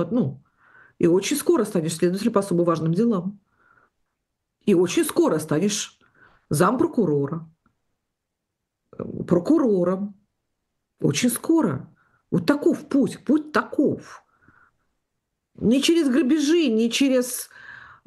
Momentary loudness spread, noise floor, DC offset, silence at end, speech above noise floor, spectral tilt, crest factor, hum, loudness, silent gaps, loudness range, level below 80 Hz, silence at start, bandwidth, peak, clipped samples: 11 LU; -81 dBFS; under 0.1%; 0.3 s; 60 dB; -5.5 dB/octave; 18 dB; none; -22 LUFS; none; 4 LU; -62 dBFS; 0 s; 12.5 kHz; -4 dBFS; under 0.1%